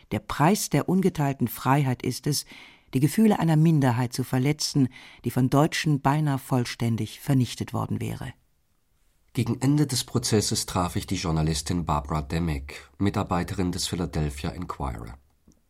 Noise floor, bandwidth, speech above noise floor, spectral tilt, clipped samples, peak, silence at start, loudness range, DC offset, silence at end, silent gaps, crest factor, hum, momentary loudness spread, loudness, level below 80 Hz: -69 dBFS; 16.5 kHz; 44 dB; -5.5 dB/octave; under 0.1%; -8 dBFS; 0.1 s; 5 LU; under 0.1%; 0.55 s; none; 18 dB; none; 12 LU; -25 LUFS; -44 dBFS